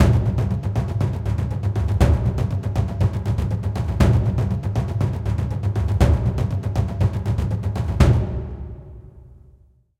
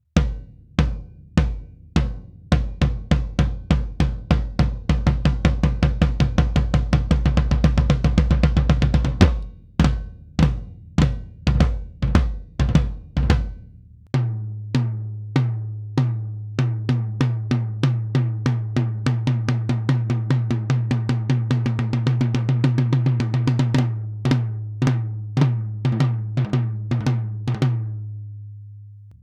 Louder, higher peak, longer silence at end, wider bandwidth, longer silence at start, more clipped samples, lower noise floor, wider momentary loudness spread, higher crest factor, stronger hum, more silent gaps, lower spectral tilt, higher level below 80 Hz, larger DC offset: about the same, -22 LUFS vs -22 LUFS; about the same, 0 dBFS vs 0 dBFS; first, 0.7 s vs 0.1 s; first, 12.5 kHz vs 9 kHz; second, 0 s vs 0.15 s; neither; first, -53 dBFS vs -45 dBFS; about the same, 7 LU vs 9 LU; about the same, 20 dB vs 20 dB; neither; neither; about the same, -8 dB/octave vs -7.5 dB/octave; about the same, -26 dBFS vs -26 dBFS; neither